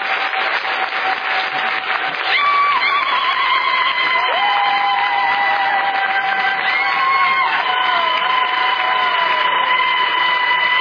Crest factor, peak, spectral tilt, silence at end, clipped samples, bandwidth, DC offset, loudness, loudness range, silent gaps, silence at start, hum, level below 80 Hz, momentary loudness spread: 12 dB; -4 dBFS; -2 dB/octave; 0 s; under 0.1%; 5.4 kHz; under 0.1%; -15 LUFS; 1 LU; none; 0 s; none; -66 dBFS; 4 LU